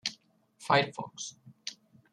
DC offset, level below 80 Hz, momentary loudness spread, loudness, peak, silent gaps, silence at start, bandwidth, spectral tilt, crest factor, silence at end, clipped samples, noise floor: under 0.1%; -78 dBFS; 16 LU; -31 LUFS; -10 dBFS; none; 0.05 s; 13 kHz; -3.5 dB/octave; 24 dB; 0.4 s; under 0.1%; -61 dBFS